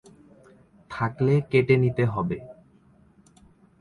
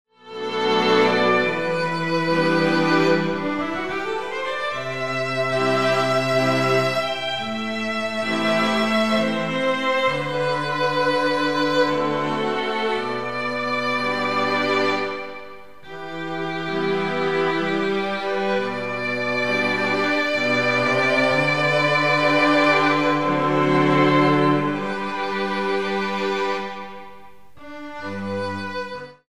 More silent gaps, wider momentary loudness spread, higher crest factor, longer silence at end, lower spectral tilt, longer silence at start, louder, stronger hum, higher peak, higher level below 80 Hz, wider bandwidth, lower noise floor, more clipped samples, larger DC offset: neither; about the same, 12 LU vs 10 LU; about the same, 20 dB vs 16 dB; first, 1.3 s vs 0 s; first, -9 dB/octave vs -5.5 dB/octave; first, 0.9 s vs 0.05 s; second, -24 LUFS vs -21 LUFS; second, none vs 50 Hz at -65 dBFS; about the same, -6 dBFS vs -6 dBFS; about the same, -56 dBFS vs -60 dBFS; second, 10.5 kHz vs 14 kHz; first, -57 dBFS vs -47 dBFS; neither; second, under 0.1% vs 0.9%